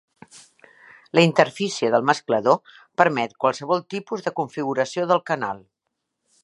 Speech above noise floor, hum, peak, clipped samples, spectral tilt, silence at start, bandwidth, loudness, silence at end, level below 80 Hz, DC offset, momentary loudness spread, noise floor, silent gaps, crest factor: 58 dB; none; 0 dBFS; under 0.1%; -5 dB/octave; 0.35 s; 11.5 kHz; -22 LUFS; 0.85 s; -72 dBFS; under 0.1%; 10 LU; -79 dBFS; none; 22 dB